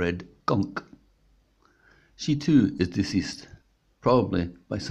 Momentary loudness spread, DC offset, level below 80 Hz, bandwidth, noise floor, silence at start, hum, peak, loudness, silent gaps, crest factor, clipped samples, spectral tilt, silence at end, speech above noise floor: 13 LU; under 0.1%; -54 dBFS; 10 kHz; -63 dBFS; 0 s; none; -8 dBFS; -26 LUFS; none; 20 dB; under 0.1%; -6.5 dB/octave; 0 s; 39 dB